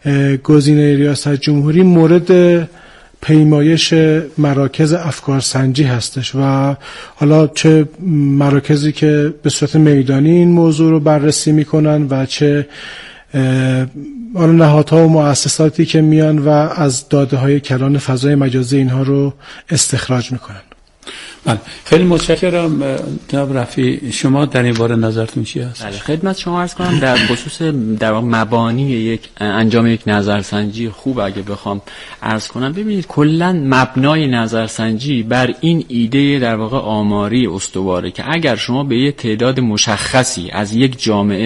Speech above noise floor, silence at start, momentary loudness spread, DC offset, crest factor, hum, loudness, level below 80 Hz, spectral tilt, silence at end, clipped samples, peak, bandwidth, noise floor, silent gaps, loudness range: 22 dB; 0.05 s; 10 LU; under 0.1%; 12 dB; none; -13 LUFS; -44 dBFS; -6 dB/octave; 0 s; under 0.1%; 0 dBFS; 11.5 kHz; -35 dBFS; none; 5 LU